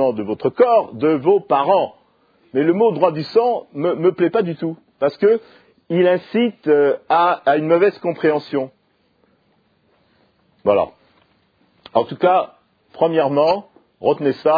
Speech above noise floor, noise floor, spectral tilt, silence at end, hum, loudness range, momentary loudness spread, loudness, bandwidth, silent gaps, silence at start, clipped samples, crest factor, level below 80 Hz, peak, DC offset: 45 dB; -61 dBFS; -9 dB/octave; 0 s; none; 6 LU; 8 LU; -18 LUFS; 5 kHz; none; 0 s; under 0.1%; 18 dB; -66 dBFS; 0 dBFS; under 0.1%